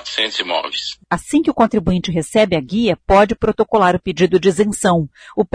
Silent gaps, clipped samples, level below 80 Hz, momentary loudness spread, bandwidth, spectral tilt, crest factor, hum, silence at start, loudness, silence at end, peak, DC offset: none; under 0.1%; -38 dBFS; 8 LU; 11 kHz; -5 dB/octave; 14 dB; none; 0.05 s; -16 LUFS; 0.1 s; -2 dBFS; under 0.1%